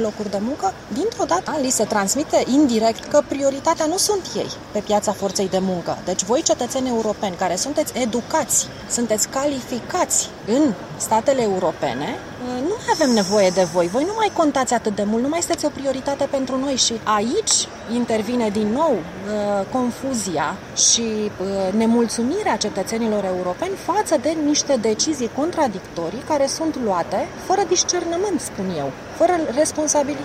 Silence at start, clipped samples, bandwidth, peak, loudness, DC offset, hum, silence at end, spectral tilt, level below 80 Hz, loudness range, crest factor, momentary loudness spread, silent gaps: 0 s; under 0.1%; 16 kHz; -2 dBFS; -20 LUFS; under 0.1%; none; 0 s; -3 dB/octave; -52 dBFS; 2 LU; 18 dB; 7 LU; none